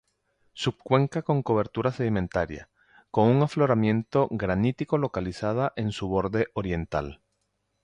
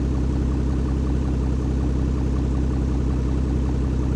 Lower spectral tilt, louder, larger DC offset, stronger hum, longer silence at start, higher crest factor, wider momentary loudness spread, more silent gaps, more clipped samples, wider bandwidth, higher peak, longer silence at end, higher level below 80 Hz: about the same, -7.5 dB/octave vs -8.5 dB/octave; second, -26 LUFS vs -23 LUFS; neither; neither; first, 0.55 s vs 0 s; first, 18 dB vs 10 dB; first, 8 LU vs 0 LU; neither; neither; first, 10 kHz vs 8.4 kHz; first, -8 dBFS vs -12 dBFS; first, 0.7 s vs 0 s; second, -48 dBFS vs -24 dBFS